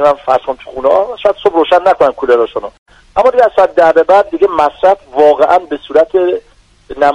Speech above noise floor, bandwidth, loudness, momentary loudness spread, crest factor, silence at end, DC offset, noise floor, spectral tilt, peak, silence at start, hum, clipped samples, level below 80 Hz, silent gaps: 20 dB; 10 kHz; -11 LUFS; 8 LU; 10 dB; 0 s; under 0.1%; -30 dBFS; -5 dB/octave; 0 dBFS; 0 s; none; 0.2%; -44 dBFS; 2.78-2.86 s